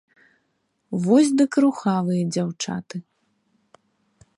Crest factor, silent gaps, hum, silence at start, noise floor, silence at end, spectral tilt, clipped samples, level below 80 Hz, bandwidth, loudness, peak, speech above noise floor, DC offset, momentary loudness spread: 18 dB; none; none; 0.9 s; -71 dBFS; 1.35 s; -6 dB/octave; under 0.1%; -68 dBFS; 11.5 kHz; -21 LUFS; -6 dBFS; 51 dB; under 0.1%; 14 LU